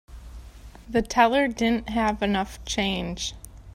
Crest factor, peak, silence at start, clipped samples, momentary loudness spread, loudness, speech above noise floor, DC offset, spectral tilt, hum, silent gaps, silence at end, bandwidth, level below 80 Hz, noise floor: 20 dB; -6 dBFS; 0.1 s; under 0.1%; 24 LU; -24 LUFS; 20 dB; under 0.1%; -4 dB/octave; none; none; 0 s; 16 kHz; -42 dBFS; -44 dBFS